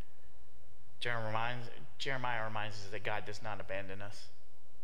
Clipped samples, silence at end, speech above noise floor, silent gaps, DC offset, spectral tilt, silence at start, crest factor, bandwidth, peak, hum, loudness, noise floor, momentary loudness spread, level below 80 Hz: under 0.1%; 0.5 s; 24 dB; none; 3%; -4.5 dB/octave; 0.05 s; 22 dB; 16 kHz; -18 dBFS; none; -40 LUFS; -64 dBFS; 12 LU; -66 dBFS